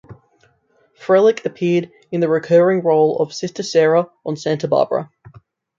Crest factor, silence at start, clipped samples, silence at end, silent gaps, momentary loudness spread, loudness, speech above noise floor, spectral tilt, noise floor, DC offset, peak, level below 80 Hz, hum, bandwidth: 16 dB; 0.1 s; under 0.1%; 0.75 s; none; 11 LU; -17 LUFS; 43 dB; -6 dB/octave; -59 dBFS; under 0.1%; -2 dBFS; -64 dBFS; none; 7.6 kHz